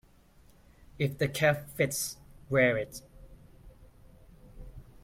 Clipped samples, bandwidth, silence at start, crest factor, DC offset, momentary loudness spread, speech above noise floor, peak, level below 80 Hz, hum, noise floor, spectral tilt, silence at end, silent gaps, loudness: under 0.1%; 16.5 kHz; 1 s; 22 dB; under 0.1%; 24 LU; 30 dB; -12 dBFS; -54 dBFS; none; -59 dBFS; -4.5 dB/octave; 0.2 s; none; -29 LUFS